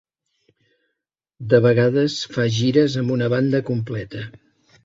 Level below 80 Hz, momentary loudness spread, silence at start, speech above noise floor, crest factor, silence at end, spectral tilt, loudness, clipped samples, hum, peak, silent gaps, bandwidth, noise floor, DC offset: -56 dBFS; 16 LU; 1.4 s; 62 dB; 18 dB; 0.55 s; -6.5 dB/octave; -19 LUFS; under 0.1%; none; -2 dBFS; none; 7.8 kHz; -80 dBFS; under 0.1%